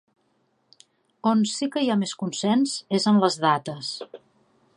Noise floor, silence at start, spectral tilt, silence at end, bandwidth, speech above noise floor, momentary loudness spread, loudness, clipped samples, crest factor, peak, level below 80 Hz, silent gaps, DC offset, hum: -69 dBFS; 1.25 s; -5 dB/octave; 0.6 s; 11 kHz; 46 dB; 12 LU; -23 LUFS; under 0.1%; 20 dB; -6 dBFS; -74 dBFS; none; under 0.1%; none